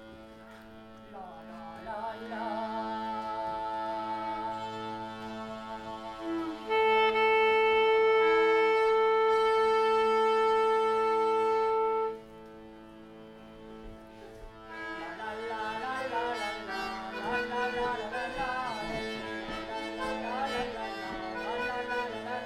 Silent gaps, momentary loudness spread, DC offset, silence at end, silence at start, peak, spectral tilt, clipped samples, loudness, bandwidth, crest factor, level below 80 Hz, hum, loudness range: none; 24 LU; under 0.1%; 0 s; 0 s; -16 dBFS; -4 dB/octave; under 0.1%; -30 LUFS; 11.5 kHz; 14 dB; -58 dBFS; none; 13 LU